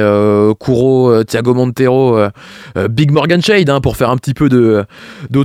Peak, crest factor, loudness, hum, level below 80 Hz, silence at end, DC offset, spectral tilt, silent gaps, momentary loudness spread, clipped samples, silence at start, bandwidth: 0 dBFS; 12 dB; -11 LUFS; none; -38 dBFS; 0 s; under 0.1%; -7 dB/octave; none; 8 LU; under 0.1%; 0 s; 15.5 kHz